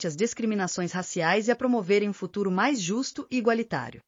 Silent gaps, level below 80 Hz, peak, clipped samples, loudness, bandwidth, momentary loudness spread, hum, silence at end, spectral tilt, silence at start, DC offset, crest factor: none; -68 dBFS; -10 dBFS; under 0.1%; -27 LUFS; 7.6 kHz; 6 LU; none; 0.1 s; -4.5 dB/octave; 0 s; under 0.1%; 16 dB